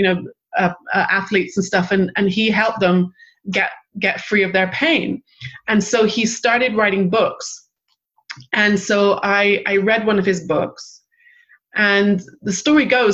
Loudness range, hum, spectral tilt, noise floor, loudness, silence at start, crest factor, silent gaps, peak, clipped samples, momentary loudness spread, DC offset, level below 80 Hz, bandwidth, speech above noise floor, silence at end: 1 LU; none; -4.5 dB/octave; -70 dBFS; -17 LUFS; 0 s; 16 dB; none; -2 dBFS; under 0.1%; 11 LU; under 0.1%; -56 dBFS; 8.2 kHz; 53 dB; 0 s